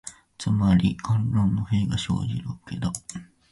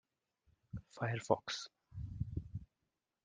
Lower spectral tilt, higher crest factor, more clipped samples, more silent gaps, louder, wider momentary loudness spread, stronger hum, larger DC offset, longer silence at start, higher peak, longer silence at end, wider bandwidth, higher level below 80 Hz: about the same, -6 dB/octave vs -5 dB/octave; second, 16 dB vs 28 dB; neither; neither; first, -25 LUFS vs -42 LUFS; about the same, 14 LU vs 15 LU; neither; neither; second, 0.05 s vs 0.75 s; first, -10 dBFS vs -14 dBFS; second, 0.3 s vs 0.6 s; first, 11.5 kHz vs 9.8 kHz; first, -44 dBFS vs -58 dBFS